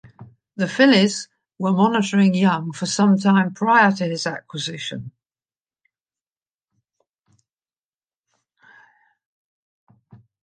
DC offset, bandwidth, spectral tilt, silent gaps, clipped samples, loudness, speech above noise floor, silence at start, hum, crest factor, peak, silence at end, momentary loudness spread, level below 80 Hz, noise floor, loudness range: under 0.1%; 9.6 kHz; -5 dB/octave; none; under 0.1%; -19 LUFS; over 72 dB; 0.2 s; none; 20 dB; -2 dBFS; 5.35 s; 15 LU; -70 dBFS; under -90 dBFS; 17 LU